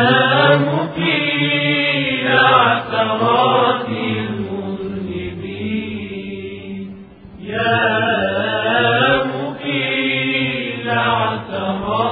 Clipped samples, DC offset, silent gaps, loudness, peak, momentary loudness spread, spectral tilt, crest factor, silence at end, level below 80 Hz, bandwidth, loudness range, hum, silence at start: under 0.1%; under 0.1%; none; -16 LUFS; 0 dBFS; 14 LU; -9 dB/octave; 16 dB; 0 s; -52 dBFS; 4.9 kHz; 10 LU; none; 0 s